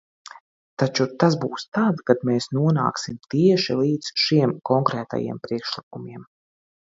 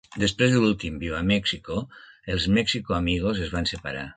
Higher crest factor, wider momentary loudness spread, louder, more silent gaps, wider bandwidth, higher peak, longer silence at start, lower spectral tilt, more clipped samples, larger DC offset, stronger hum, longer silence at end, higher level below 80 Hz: about the same, 22 dB vs 20 dB; about the same, 12 LU vs 12 LU; first, -22 LUFS vs -25 LUFS; first, 1.68-1.72 s, 5.83-5.91 s vs none; second, 7.8 kHz vs 9.4 kHz; first, -2 dBFS vs -6 dBFS; first, 0.8 s vs 0.1 s; about the same, -6 dB/octave vs -5 dB/octave; neither; neither; neither; first, 0.65 s vs 0.05 s; second, -64 dBFS vs -40 dBFS